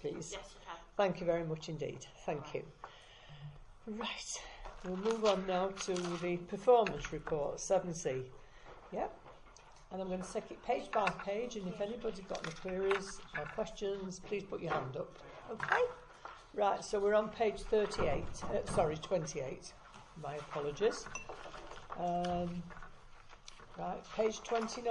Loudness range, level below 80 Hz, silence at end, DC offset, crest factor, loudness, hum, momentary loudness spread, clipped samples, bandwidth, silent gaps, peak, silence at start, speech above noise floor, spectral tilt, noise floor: 6 LU; -58 dBFS; 0 s; under 0.1%; 22 dB; -37 LUFS; none; 19 LU; under 0.1%; 11 kHz; none; -16 dBFS; 0 s; 21 dB; -4.5 dB/octave; -58 dBFS